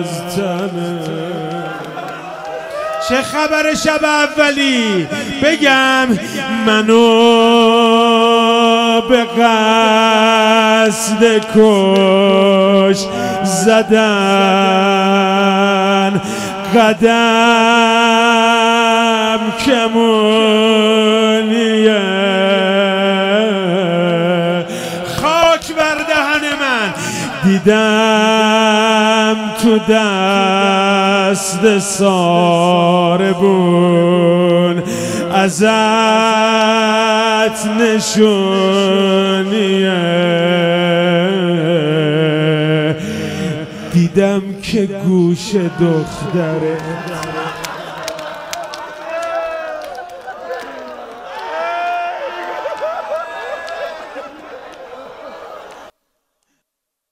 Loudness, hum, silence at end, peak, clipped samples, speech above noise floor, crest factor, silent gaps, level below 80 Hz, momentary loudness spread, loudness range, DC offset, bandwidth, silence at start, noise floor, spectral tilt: -12 LUFS; none; 1.25 s; 0 dBFS; under 0.1%; 66 dB; 12 dB; none; -50 dBFS; 15 LU; 13 LU; under 0.1%; 16 kHz; 0 s; -78 dBFS; -4.5 dB/octave